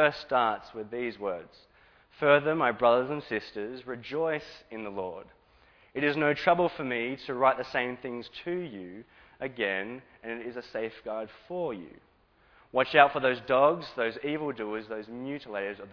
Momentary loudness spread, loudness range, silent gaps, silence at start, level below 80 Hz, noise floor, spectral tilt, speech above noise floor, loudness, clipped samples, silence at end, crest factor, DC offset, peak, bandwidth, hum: 16 LU; 8 LU; none; 0 s; -66 dBFS; -63 dBFS; -6.5 dB/octave; 34 dB; -29 LUFS; under 0.1%; 0 s; 28 dB; under 0.1%; -2 dBFS; 5.4 kHz; none